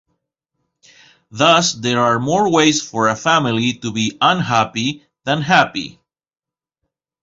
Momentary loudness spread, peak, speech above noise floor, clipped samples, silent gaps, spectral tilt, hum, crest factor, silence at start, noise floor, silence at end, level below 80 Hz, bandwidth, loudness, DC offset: 9 LU; 0 dBFS; 62 dB; under 0.1%; none; -4 dB/octave; none; 18 dB; 1.35 s; -78 dBFS; 1.35 s; -56 dBFS; 7.8 kHz; -16 LUFS; under 0.1%